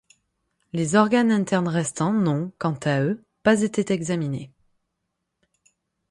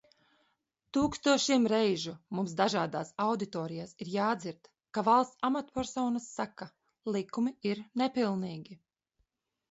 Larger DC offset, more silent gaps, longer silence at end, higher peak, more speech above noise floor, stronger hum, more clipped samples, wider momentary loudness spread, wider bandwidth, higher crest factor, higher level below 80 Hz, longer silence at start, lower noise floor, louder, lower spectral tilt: neither; neither; first, 1.65 s vs 0.95 s; first, -4 dBFS vs -12 dBFS; first, 57 dB vs 48 dB; neither; neither; second, 9 LU vs 13 LU; first, 11.5 kHz vs 8 kHz; about the same, 20 dB vs 20 dB; about the same, -62 dBFS vs -66 dBFS; second, 0.75 s vs 0.95 s; about the same, -79 dBFS vs -79 dBFS; first, -23 LUFS vs -32 LUFS; first, -6 dB/octave vs -4.5 dB/octave